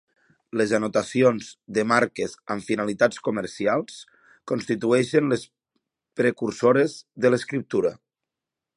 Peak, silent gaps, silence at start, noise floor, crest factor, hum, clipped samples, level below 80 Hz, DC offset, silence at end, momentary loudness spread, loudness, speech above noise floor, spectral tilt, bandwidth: -4 dBFS; none; 0.55 s; -87 dBFS; 20 dB; none; under 0.1%; -66 dBFS; under 0.1%; 0.85 s; 10 LU; -24 LUFS; 64 dB; -5.5 dB/octave; 11 kHz